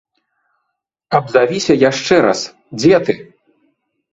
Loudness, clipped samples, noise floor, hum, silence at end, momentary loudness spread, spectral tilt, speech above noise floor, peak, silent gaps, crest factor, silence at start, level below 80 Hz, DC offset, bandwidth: -14 LUFS; under 0.1%; -74 dBFS; none; 0.9 s; 9 LU; -5 dB/octave; 61 dB; 0 dBFS; none; 16 dB; 1.1 s; -54 dBFS; under 0.1%; 8 kHz